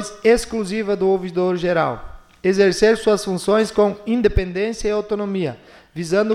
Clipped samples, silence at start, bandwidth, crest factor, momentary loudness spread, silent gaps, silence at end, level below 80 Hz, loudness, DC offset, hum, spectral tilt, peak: under 0.1%; 0 s; 13.5 kHz; 16 dB; 8 LU; none; 0 s; -34 dBFS; -19 LUFS; under 0.1%; none; -5.5 dB/octave; -4 dBFS